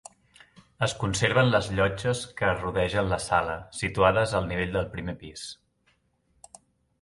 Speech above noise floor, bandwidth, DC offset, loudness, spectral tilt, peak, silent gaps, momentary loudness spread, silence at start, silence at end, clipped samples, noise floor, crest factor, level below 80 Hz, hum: 43 dB; 11.5 kHz; under 0.1%; -26 LUFS; -5 dB/octave; -6 dBFS; none; 14 LU; 0.8 s; 1.5 s; under 0.1%; -69 dBFS; 22 dB; -46 dBFS; none